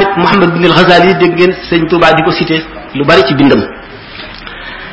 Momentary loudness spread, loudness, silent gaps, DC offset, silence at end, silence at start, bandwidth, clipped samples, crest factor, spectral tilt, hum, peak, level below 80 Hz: 19 LU; -8 LUFS; none; under 0.1%; 0 s; 0 s; 8 kHz; 1%; 10 dB; -6.5 dB/octave; none; 0 dBFS; -36 dBFS